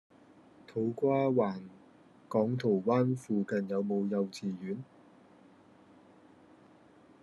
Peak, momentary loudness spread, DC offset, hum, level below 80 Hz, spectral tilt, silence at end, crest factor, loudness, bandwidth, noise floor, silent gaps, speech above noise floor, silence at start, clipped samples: -16 dBFS; 13 LU; under 0.1%; none; -80 dBFS; -8 dB/octave; 2.4 s; 18 dB; -32 LUFS; 12 kHz; -60 dBFS; none; 29 dB; 0.7 s; under 0.1%